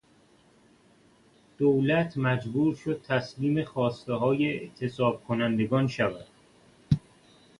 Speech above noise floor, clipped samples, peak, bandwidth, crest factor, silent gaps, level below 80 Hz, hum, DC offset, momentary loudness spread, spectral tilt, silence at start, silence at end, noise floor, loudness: 34 dB; under 0.1%; -8 dBFS; 11.5 kHz; 20 dB; none; -56 dBFS; none; under 0.1%; 5 LU; -8 dB/octave; 1.6 s; 0.6 s; -61 dBFS; -28 LUFS